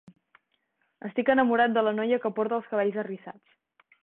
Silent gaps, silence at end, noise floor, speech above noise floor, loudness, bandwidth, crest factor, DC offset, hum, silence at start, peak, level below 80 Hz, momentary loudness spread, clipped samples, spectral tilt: none; 0.7 s; -75 dBFS; 49 dB; -26 LUFS; 4.1 kHz; 18 dB; under 0.1%; none; 1.05 s; -10 dBFS; -72 dBFS; 16 LU; under 0.1%; -9 dB/octave